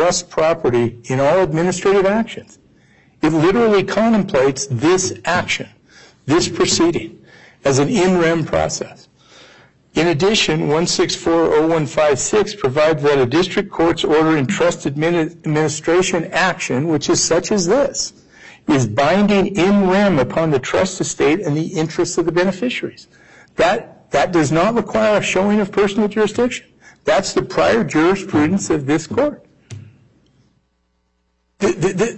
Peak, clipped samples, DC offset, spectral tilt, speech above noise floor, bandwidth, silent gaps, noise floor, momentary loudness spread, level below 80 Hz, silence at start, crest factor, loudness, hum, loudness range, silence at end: -4 dBFS; under 0.1%; under 0.1%; -4.5 dB/octave; 50 dB; 8.6 kHz; none; -66 dBFS; 7 LU; -46 dBFS; 0 s; 12 dB; -16 LUFS; none; 3 LU; 0 s